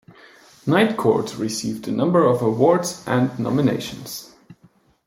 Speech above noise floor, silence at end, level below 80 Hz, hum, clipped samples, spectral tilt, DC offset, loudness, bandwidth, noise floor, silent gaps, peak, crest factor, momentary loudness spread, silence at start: 37 dB; 0.55 s; -58 dBFS; none; under 0.1%; -6 dB/octave; under 0.1%; -20 LUFS; 16.5 kHz; -56 dBFS; none; -4 dBFS; 18 dB; 13 LU; 0.65 s